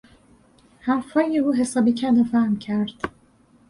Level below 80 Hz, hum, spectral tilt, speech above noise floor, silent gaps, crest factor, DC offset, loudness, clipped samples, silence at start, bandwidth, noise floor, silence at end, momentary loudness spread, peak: -58 dBFS; none; -6 dB/octave; 36 dB; none; 16 dB; under 0.1%; -22 LUFS; under 0.1%; 0.85 s; 11.5 kHz; -56 dBFS; 0.6 s; 11 LU; -8 dBFS